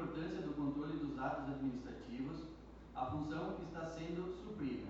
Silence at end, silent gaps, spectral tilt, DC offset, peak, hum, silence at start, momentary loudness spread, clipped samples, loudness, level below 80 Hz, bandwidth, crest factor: 0 s; none; -7.5 dB/octave; under 0.1%; -26 dBFS; none; 0 s; 8 LU; under 0.1%; -44 LUFS; -60 dBFS; 7.8 kHz; 16 dB